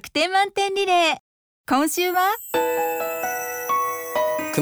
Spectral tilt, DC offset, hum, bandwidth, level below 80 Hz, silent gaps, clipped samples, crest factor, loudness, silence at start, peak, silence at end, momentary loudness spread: -2.5 dB/octave; under 0.1%; none; over 20 kHz; -62 dBFS; 1.20-1.64 s; under 0.1%; 16 dB; -22 LUFS; 0.05 s; -6 dBFS; 0 s; 7 LU